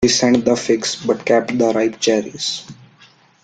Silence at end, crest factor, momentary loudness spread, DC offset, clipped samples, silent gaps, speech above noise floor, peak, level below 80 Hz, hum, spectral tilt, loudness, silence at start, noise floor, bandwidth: 0.7 s; 16 dB; 8 LU; under 0.1%; under 0.1%; none; 33 dB; -2 dBFS; -52 dBFS; none; -3.5 dB/octave; -17 LUFS; 0 s; -50 dBFS; 9.4 kHz